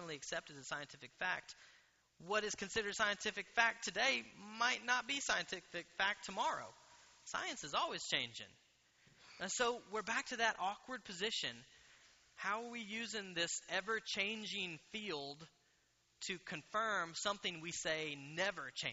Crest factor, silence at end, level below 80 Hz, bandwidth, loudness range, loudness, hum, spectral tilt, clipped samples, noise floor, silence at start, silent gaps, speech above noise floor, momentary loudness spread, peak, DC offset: 26 dB; 0 s; -76 dBFS; 8 kHz; 5 LU; -40 LUFS; none; 0 dB/octave; under 0.1%; -77 dBFS; 0 s; none; 35 dB; 11 LU; -16 dBFS; under 0.1%